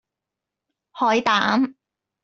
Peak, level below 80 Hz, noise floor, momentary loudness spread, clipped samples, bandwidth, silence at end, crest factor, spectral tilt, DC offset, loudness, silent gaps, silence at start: -4 dBFS; -66 dBFS; -86 dBFS; 6 LU; under 0.1%; 7.6 kHz; 0.5 s; 20 dB; -4 dB/octave; under 0.1%; -20 LUFS; none; 0.95 s